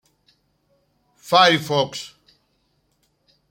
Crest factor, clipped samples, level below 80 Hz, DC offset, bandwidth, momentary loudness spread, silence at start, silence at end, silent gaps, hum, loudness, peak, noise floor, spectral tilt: 24 dB; under 0.1%; -68 dBFS; under 0.1%; 16.5 kHz; 19 LU; 1.25 s; 1.45 s; none; none; -17 LUFS; 0 dBFS; -67 dBFS; -3.5 dB/octave